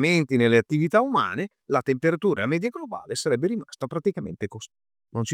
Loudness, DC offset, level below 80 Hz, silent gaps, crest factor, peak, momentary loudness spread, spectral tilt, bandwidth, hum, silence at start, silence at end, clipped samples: -24 LUFS; under 0.1%; -66 dBFS; none; 18 dB; -6 dBFS; 14 LU; -6 dB/octave; 14.5 kHz; none; 0 s; 0 s; under 0.1%